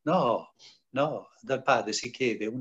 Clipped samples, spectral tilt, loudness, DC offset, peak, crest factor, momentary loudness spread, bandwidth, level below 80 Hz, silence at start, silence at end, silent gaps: under 0.1%; -4.5 dB/octave; -29 LUFS; under 0.1%; -10 dBFS; 20 dB; 8 LU; 8.6 kHz; -74 dBFS; 0.05 s; 0 s; none